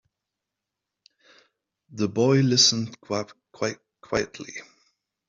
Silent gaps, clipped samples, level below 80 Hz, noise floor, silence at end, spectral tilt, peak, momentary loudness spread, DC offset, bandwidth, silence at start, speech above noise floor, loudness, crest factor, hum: none; under 0.1%; -62 dBFS; -86 dBFS; 0.65 s; -4 dB/octave; -4 dBFS; 23 LU; under 0.1%; 7.8 kHz; 1.9 s; 62 dB; -23 LUFS; 22 dB; none